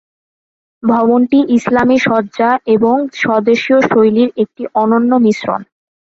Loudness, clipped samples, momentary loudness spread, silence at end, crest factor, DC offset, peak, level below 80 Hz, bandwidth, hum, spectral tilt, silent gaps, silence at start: -12 LUFS; under 0.1%; 6 LU; 0.4 s; 12 dB; under 0.1%; 0 dBFS; -52 dBFS; 7.8 kHz; none; -6.5 dB/octave; none; 0.85 s